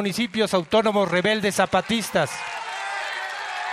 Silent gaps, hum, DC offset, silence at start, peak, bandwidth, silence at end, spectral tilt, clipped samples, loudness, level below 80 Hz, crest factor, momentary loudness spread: none; none; under 0.1%; 0 s; -6 dBFS; 16 kHz; 0 s; -4 dB/octave; under 0.1%; -23 LUFS; -58 dBFS; 18 dB; 9 LU